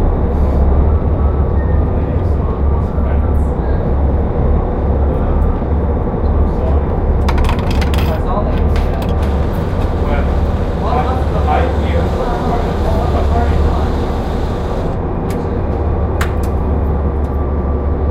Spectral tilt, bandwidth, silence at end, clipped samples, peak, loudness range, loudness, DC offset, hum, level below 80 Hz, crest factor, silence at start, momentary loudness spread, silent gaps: -8.5 dB/octave; 8.4 kHz; 0 s; under 0.1%; -2 dBFS; 2 LU; -16 LUFS; under 0.1%; none; -16 dBFS; 12 dB; 0 s; 3 LU; none